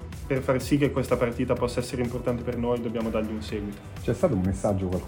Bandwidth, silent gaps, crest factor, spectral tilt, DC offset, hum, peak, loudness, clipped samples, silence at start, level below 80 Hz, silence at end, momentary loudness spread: 17 kHz; none; 18 dB; -7 dB/octave; under 0.1%; none; -8 dBFS; -27 LUFS; under 0.1%; 0 s; -42 dBFS; 0 s; 7 LU